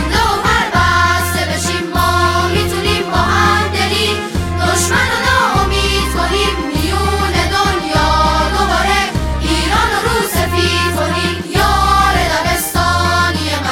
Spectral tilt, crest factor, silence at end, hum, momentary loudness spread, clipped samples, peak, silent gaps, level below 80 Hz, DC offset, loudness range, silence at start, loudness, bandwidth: -4 dB/octave; 14 dB; 0 s; none; 4 LU; under 0.1%; 0 dBFS; none; -24 dBFS; under 0.1%; 1 LU; 0 s; -13 LUFS; 17 kHz